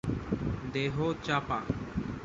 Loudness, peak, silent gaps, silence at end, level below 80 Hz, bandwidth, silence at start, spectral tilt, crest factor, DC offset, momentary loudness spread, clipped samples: -33 LUFS; -14 dBFS; none; 0 s; -46 dBFS; 7.8 kHz; 0.05 s; -6.5 dB/octave; 18 dB; under 0.1%; 4 LU; under 0.1%